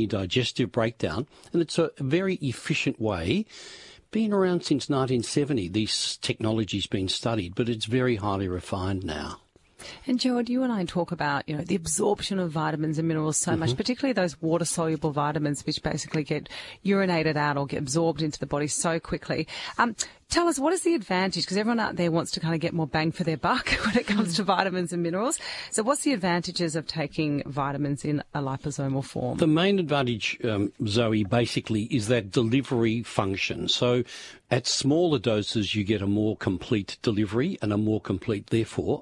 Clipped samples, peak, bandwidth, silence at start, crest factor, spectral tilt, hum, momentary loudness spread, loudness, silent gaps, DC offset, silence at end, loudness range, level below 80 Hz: under 0.1%; -6 dBFS; 11.5 kHz; 0 s; 20 dB; -5 dB/octave; none; 6 LU; -26 LUFS; none; under 0.1%; 0 s; 3 LU; -54 dBFS